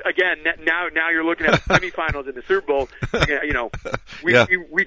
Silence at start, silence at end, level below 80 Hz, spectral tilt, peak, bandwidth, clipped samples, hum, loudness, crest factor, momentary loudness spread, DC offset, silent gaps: 0 s; 0 s; -38 dBFS; -5 dB/octave; -2 dBFS; 7.8 kHz; under 0.1%; none; -20 LUFS; 18 dB; 9 LU; under 0.1%; none